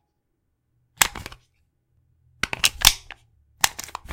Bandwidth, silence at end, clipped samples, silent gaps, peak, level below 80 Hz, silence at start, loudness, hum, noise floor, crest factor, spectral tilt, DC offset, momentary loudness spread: 17 kHz; 0 s; under 0.1%; none; 0 dBFS; -42 dBFS; 1 s; -20 LUFS; none; -74 dBFS; 28 dB; 0.5 dB/octave; under 0.1%; 20 LU